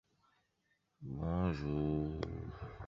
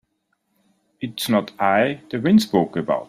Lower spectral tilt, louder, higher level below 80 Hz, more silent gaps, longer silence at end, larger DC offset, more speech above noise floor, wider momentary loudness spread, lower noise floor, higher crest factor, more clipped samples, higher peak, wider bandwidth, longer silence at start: first, -8 dB/octave vs -5.5 dB/octave; second, -39 LUFS vs -20 LUFS; first, -50 dBFS vs -62 dBFS; neither; about the same, 0 s vs 0.05 s; neither; second, 43 dB vs 52 dB; about the same, 12 LU vs 11 LU; first, -80 dBFS vs -71 dBFS; about the same, 18 dB vs 16 dB; neither; second, -22 dBFS vs -4 dBFS; second, 7.2 kHz vs 15.5 kHz; about the same, 1 s vs 1 s